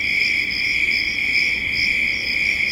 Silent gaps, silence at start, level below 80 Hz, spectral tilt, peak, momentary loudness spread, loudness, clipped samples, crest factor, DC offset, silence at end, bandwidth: none; 0 s; -44 dBFS; -1.5 dB/octave; -6 dBFS; 1 LU; -17 LUFS; under 0.1%; 14 dB; under 0.1%; 0 s; 16.5 kHz